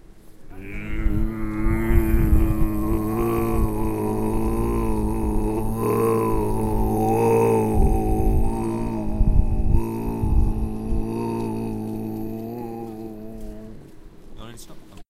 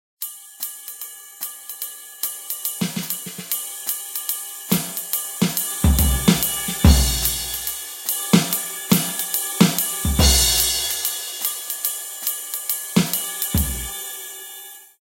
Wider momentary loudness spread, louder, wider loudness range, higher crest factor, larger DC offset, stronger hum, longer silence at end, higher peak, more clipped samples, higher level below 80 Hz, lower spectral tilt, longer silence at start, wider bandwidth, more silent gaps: about the same, 16 LU vs 15 LU; second, -24 LUFS vs -21 LUFS; about the same, 8 LU vs 8 LU; about the same, 18 dB vs 22 dB; neither; neither; about the same, 0.1 s vs 0.15 s; second, -4 dBFS vs 0 dBFS; neither; first, -24 dBFS vs -30 dBFS; first, -8 dB/octave vs -3.5 dB/octave; about the same, 0.15 s vs 0.2 s; second, 15.5 kHz vs 17.5 kHz; neither